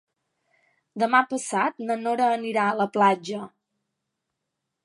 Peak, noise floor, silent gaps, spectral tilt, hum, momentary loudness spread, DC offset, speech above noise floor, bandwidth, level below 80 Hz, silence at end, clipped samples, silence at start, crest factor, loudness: -4 dBFS; -82 dBFS; none; -4.5 dB/octave; none; 13 LU; under 0.1%; 59 dB; 11.5 kHz; -80 dBFS; 1.4 s; under 0.1%; 0.95 s; 22 dB; -24 LUFS